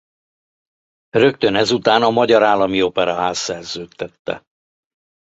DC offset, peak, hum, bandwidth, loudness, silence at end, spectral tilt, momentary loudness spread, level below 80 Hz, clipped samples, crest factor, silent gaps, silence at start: under 0.1%; -2 dBFS; none; 8.2 kHz; -16 LUFS; 0.9 s; -4 dB/octave; 15 LU; -54 dBFS; under 0.1%; 18 dB; 4.19-4.25 s; 1.15 s